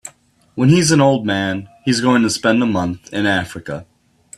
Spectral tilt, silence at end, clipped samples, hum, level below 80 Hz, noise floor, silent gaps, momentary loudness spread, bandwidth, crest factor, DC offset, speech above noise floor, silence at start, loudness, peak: -5 dB/octave; 0.55 s; under 0.1%; none; -52 dBFS; -50 dBFS; none; 16 LU; 13.5 kHz; 16 dB; under 0.1%; 34 dB; 0.05 s; -16 LUFS; 0 dBFS